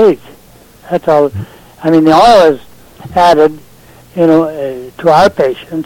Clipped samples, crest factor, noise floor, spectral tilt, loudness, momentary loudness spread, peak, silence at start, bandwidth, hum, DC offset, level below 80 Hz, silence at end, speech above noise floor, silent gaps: 0.3%; 10 dB; -40 dBFS; -6 dB/octave; -10 LUFS; 15 LU; 0 dBFS; 0 s; 16.5 kHz; none; under 0.1%; -42 dBFS; 0 s; 31 dB; none